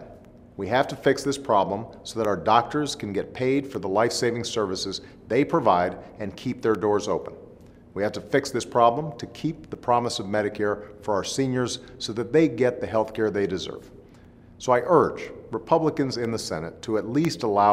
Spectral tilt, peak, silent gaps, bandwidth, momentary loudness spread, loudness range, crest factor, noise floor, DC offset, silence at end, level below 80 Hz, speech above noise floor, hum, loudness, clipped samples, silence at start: -5 dB/octave; -4 dBFS; none; 15.5 kHz; 12 LU; 2 LU; 20 dB; -49 dBFS; under 0.1%; 0 s; -56 dBFS; 25 dB; none; -25 LUFS; under 0.1%; 0 s